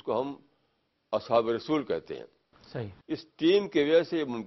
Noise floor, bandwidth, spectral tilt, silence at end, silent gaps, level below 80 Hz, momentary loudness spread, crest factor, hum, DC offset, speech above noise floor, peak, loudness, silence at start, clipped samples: -75 dBFS; 6 kHz; -6.5 dB/octave; 0 s; none; -68 dBFS; 17 LU; 18 dB; none; under 0.1%; 46 dB; -10 dBFS; -28 LUFS; 0.05 s; under 0.1%